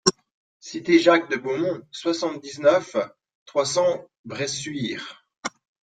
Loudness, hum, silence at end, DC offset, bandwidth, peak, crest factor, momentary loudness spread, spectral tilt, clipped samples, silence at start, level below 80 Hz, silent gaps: -23 LUFS; none; 0.4 s; under 0.1%; 9.4 kHz; -2 dBFS; 22 dB; 16 LU; -3.5 dB/octave; under 0.1%; 0.05 s; -66 dBFS; 0.31-0.60 s, 3.35-3.46 s, 4.18-4.24 s, 5.38-5.43 s